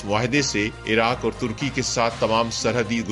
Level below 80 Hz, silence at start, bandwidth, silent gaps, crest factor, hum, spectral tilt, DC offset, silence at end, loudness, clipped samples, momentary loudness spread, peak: -44 dBFS; 0 s; 11.5 kHz; none; 18 dB; none; -4 dB/octave; under 0.1%; 0 s; -22 LUFS; under 0.1%; 5 LU; -4 dBFS